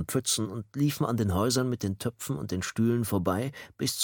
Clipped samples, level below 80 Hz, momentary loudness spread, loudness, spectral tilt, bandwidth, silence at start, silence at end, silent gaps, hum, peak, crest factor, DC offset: under 0.1%; -54 dBFS; 7 LU; -29 LUFS; -5 dB/octave; 17.5 kHz; 0 s; 0 s; none; none; -12 dBFS; 16 dB; under 0.1%